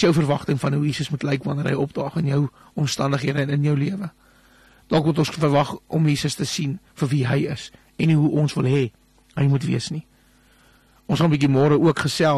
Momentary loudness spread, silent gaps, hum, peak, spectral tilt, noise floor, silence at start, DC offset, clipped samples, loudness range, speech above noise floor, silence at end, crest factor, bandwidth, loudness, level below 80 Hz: 9 LU; none; none; -8 dBFS; -6.5 dB/octave; -56 dBFS; 0 s; under 0.1%; under 0.1%; 2 LU; 36 dB; 0 s; 14 dB; 13 kHz; -22 LUFS; -54 dBFS